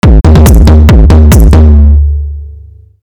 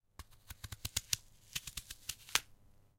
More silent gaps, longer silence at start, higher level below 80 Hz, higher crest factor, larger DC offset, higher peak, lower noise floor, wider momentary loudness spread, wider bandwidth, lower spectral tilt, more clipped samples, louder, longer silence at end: neither; second, 0.05 s vs 0.2 s; first, -4 dBFS vs -58 dBFS; second, 2 dB vs 36 dB; neither; first, 0 dBFS vs -8 dBFS; second, -30 dBFS vs -63 dBFS; second, 11 LU vs 18 LU; about the same, 16 kHz vs 17 kHz; first, -7 dB/octave vs 0 dB/octave; first, 20% vs under 0.1%; first, -4 LUFS vs -40 LUFS; about the same, 0.55 s vs 0.45 s